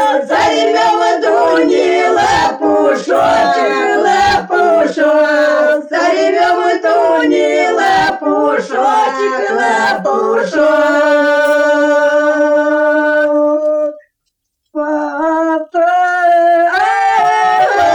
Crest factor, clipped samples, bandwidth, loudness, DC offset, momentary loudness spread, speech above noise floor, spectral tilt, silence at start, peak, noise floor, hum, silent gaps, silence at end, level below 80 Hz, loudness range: 10 dB; under 0.1%; 19.5 kHz; -11 LUFS; under 0.1%; 4 LU; 59 dB; -3.5 dB/octave; 0 s; -2 dBFS; -70 dBFS; none; none; 0 s; -50 dBFS; 3 LU